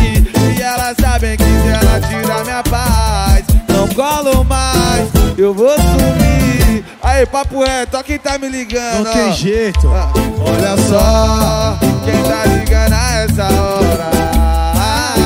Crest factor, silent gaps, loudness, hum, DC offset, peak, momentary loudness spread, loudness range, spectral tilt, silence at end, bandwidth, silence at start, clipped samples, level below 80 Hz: 12 dB; none; -13 LUFS; none; under 0.1%; 0 dBFS; 5 LU; 3 LU; -5 dB/octave; 0 s; 16.5 kHz; 0 s; under 0.1%; -16 dBFS